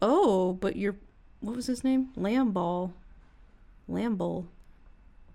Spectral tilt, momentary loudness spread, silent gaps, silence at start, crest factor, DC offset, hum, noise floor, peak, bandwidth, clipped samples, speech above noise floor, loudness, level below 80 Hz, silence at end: -7 dB/octave; 14 LU; none; 0 s; 18 dB; under 0.1%; none; -55 dBFS; -12 dBFS; 12.5 kHz; under 0.1%; 25 dB; -29 LUFS; -54 dBFS; 0.1 s